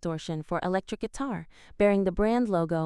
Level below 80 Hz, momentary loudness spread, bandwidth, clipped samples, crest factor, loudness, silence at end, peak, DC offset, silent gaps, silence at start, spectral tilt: -46 dBFS; 10 LU; 11.5 kHz; under 0.1%; 18 dB; -28 LUFS; 0 s; -10 dBFS; under 0.1%; none; 0.05 s; -7 dB/octave